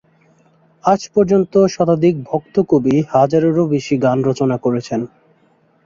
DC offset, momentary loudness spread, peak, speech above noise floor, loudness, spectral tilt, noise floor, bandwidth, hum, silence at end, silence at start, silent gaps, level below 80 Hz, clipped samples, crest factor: under 0.1%; 7 LU; 0 dBFS; 41 dB; -16 LUFS; -7.5 dB/octave; -56 dBFS; 7.6 kHz; none; 0.8 s; 0.85 s; none; -54 dBFS; under 0.1%; 16 dB